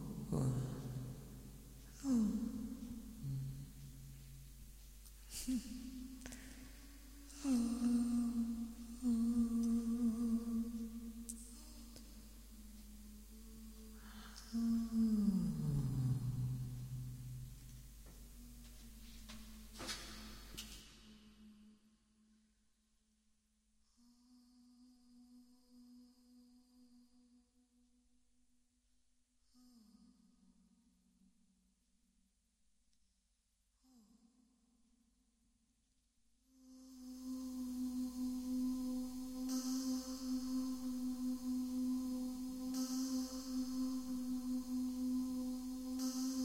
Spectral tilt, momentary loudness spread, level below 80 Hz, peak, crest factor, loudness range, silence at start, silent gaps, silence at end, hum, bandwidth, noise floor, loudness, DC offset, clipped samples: -6 dB/octave; 21 LU; -60 dBFS; -26 dBFS; 18 dB; 13 LU; 0 s; none; 0 s; none; 16 kHz; -81 dBFS; -41 LUFS; under 0.1%; under 0.1%